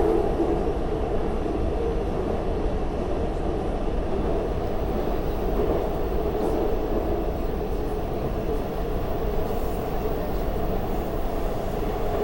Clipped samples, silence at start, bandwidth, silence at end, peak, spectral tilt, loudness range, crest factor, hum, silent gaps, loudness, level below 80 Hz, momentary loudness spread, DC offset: under 0.1%; 0 s; 16 kHz; 0 s; -10 dBFS; -8 dB/octave; 2 LU; 14 dB; none; none; -27 LUFS; -28 dBFS; 4 LU; 0.4%